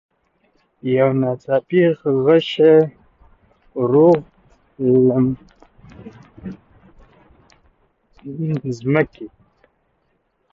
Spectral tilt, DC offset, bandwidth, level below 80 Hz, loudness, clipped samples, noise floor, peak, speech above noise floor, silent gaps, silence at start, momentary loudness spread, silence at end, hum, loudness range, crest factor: -8.5 dB/octave; under 0.1%; 7.2 kHz; -56 dBFS; -17 LUFS; under 0.1%; -66 dBFS; -2 dBFS; 50 dB; none; 0.85 s; 23 LU; 1.25 s; none; 11 LU; 18 dB